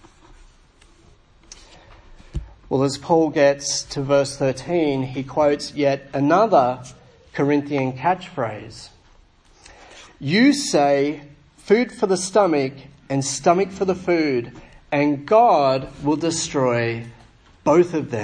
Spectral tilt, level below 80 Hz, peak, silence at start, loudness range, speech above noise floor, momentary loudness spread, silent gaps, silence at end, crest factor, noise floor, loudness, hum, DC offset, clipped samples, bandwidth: -5 dB/octave; -48 dBFS; -2 dBFS; 2.35 s; 4 LU; 33 dB; 13 LU; none; 0 s; 18 dB; -53 dBFS; -20 LUFS; none; under 0.1%; under 0.1%; 10.5 kHz